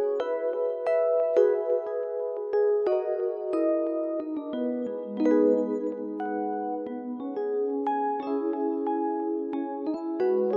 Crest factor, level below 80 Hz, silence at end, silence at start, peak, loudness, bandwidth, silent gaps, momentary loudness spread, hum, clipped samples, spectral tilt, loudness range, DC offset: 16 dB; -82 dBFS; 0 s; 0 s; -10 dBFS; -28 LUFS; 6.8 kHz; none; 9 LU; none; under 0.1%; -8 dB/octave; 3 LU; under 0.1%